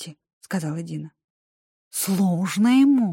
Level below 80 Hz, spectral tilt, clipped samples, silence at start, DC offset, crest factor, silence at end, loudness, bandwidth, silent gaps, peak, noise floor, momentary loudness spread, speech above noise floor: -72 dBFS; -5.5 dB/octave; under 0.1%; 0 s; under 0.1%; 14 dB; 0 s; -22 LUFS; 17 kHz; 0.33-0.41 s, 1.24-1.91 s; -10 dBFS; under -90 dBFS; 18 LU; over 70 dB